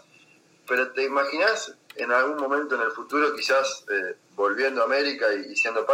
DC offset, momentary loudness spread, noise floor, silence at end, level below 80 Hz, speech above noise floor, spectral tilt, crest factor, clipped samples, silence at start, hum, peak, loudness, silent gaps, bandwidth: under 0.1%; 6 LU; -57 dBFS; 0 s; -82 dBFS; 33 dB; -1.5 dB/octave; 18 dB; under 0.1%; 0.65 s; none; -8 dBFS; -24 LUFS; none; 16 kHz